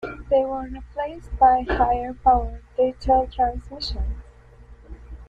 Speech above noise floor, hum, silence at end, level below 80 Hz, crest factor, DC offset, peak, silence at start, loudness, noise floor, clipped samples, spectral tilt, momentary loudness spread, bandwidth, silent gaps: 25 dB; 60 Hz at -40 dBFS; 0.05 s; -34 dBFS; 18 dB; under 0.1%; -4 dBFS; 0 s; -22 LUFS; -47 dBFS; under 0.1%; -7 dB/octave; 14 LU; 7.6 kHz; none